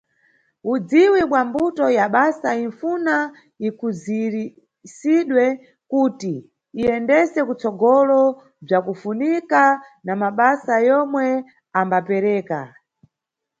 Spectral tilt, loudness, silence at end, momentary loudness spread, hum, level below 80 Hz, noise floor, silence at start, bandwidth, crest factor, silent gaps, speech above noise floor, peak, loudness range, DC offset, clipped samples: -6.5 dB/octave; -19 LUFS; 0.95 s; 13 LU; none; -62 dBFS; -83 dBFS; 0.65 s; 8 kHz; 18 dB; none; 65 dB; -2 dBFS; 4 LU; under 0.1%; under 0.1%